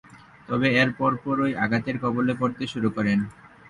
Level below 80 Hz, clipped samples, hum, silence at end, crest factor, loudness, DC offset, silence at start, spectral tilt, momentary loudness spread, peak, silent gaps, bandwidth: -58 dBFS; under 0.1%; none; 0.2 s; 18 dB; -24 LUFS; under 0.1%; 0.15 s; -7 dB/octave; 7 LU; -8 dBFS; none; 11 kHz